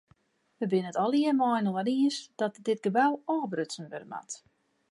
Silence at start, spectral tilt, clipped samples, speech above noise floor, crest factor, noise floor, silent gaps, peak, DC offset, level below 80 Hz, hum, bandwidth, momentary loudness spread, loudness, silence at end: 0.6 s; -5.5 dB/octave; under 0.1%; 38 dB; 18 dB; -67 dBFS; none; -12 dBFS; under 0.1%; -82 dBFS; none; 11.5 kHz; 14 LU; -29 LUFS; 0.55 s